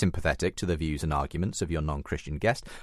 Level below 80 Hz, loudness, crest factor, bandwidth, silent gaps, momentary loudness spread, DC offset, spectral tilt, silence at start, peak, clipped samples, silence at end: -38 dBFS; -30 LUFS; 18 dB; 13.5 kHz; none; 4 LU; under 0.1%; -5.5 dB/octave; 0 s; -12 dBFS; under 0.1%; 0 s